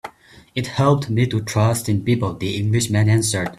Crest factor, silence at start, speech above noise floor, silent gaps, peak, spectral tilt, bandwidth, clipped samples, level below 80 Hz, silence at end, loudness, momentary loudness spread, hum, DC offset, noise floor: 16 dB; 0.05 s; 28 dB; none; -2 dBFS; -5.5 dB/octave; 14 kHz; under 0.1%; -48 dBFS; 0.05 s; -19 LUFS; 8 LU; none; under 0.1%; -46 dBFS